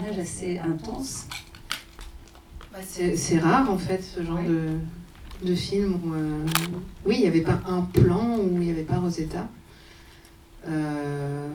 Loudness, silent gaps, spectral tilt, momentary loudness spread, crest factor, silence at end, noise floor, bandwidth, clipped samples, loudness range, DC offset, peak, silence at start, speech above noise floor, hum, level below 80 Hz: -26 LUFS; none; -6 dB/octave; 17 LU; 24 dB; 0 s; -50 dBFS; over 20 kHz; under 0.1%; 5 LU; under 0.1%; -4 dBFS; 0 s; 25 dB; none; -44 dBFS